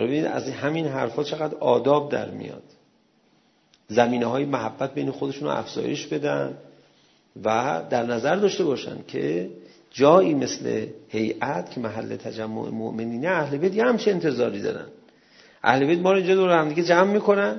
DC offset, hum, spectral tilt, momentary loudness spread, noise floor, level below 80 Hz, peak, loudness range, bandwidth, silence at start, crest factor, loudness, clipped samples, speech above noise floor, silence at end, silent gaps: under 0.1%; none; -6 dB/octave; 12 LU; -62 dBFS; -68 dBFS; -2 dBFS; 5 LU; 6.4 kHz; 0 s; 22 dB; -23 LUFS; under 0.1%; 39 dB; 0 s; none